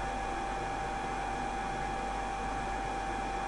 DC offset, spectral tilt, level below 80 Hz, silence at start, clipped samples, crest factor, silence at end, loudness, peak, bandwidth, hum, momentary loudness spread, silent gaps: under 0.1%; -4.5 dB/octave; -44 dBFS; 0 s; under 0.1%; 12 dB; 0 s; -36 LUFS; -24 dBFS; 11.5 kHz; 50 Hz at -55 dBFS; 0 LU; none